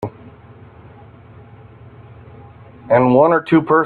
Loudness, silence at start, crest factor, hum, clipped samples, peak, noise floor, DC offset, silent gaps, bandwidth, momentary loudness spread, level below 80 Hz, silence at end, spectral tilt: -13 LUFS; 0 s; 18 dB; none; under 0.1%; 0 dBFS; -42 dBFS; under 0.1%; none; 4.5 kHz; 7 LU; -52 dBFS; 0 s; -9.5 dB/octave